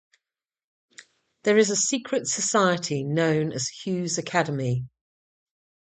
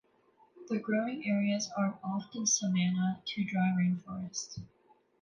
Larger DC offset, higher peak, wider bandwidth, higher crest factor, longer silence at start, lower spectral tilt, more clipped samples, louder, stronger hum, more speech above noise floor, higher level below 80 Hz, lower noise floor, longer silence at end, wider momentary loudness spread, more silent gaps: neither; first, -6 dBFS vs -16 dBFS; second, 9.4 kHz vs 10.5 kHz; about the same, 20 dB vs 16 dB; first, 1 s vs 0.55 s; about the same, -4 dB/octave vs -4.5 dB/octave; neither; first, -24 LUFS vs -32 LUFS; neither; first, over 66 dB vs 35 dB; about the same, -66 dBFS vs -70 dBFS; first, under -90 dBFS vs -67 dBFS; first, 0.95 s vs 0.55 s; about the same, 8 LU vs 10 LU; neither